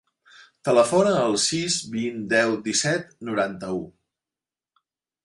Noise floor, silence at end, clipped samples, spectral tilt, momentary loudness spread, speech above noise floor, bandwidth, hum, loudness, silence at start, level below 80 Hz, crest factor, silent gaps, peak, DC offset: under -90 dBFS; 1.35 s; under 0.1%; -3.5 dB/octave; 12 LU; over 67 dB; 11.5 kHz; none; -23 LUFS; 0.4 s; -64 dBFS; 20 dB; none; -6 dBFS; under 0.1%